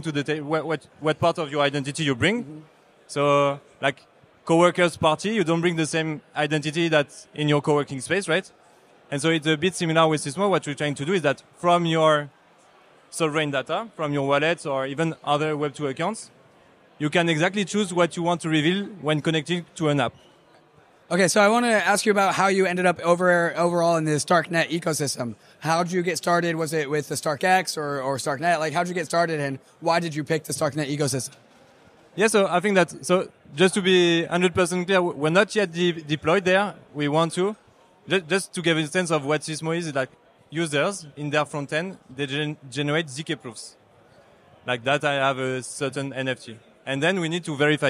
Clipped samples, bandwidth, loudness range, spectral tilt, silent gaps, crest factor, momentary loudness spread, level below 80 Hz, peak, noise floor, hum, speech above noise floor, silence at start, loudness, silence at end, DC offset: under 0.1%; 15.5 kHz; 6 LU; -4.5 dB/octave; none; 18 dB; 10 LU; -66 dBFS; -6 dBFS; -56 dBFS; none; 33 dB; 0 s; -23 LUFS; 0 s; under 0.1%